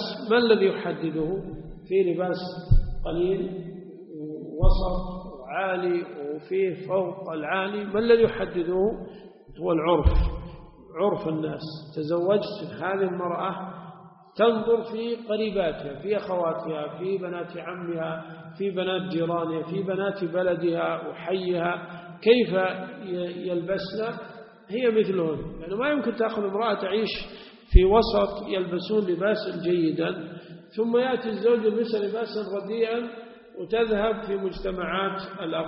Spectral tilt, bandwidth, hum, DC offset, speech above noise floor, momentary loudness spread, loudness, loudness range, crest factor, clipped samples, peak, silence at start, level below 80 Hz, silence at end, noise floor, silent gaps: -5 dB/octave; 5.8 kHz; none; under 0.1%; 22 dB; 15 LU; -26 LUFS; 5 LU; 24 dB; under 0.1%; -2 dBFS; 0 s; -34 dBFS; 0 s; -47 dBFS; none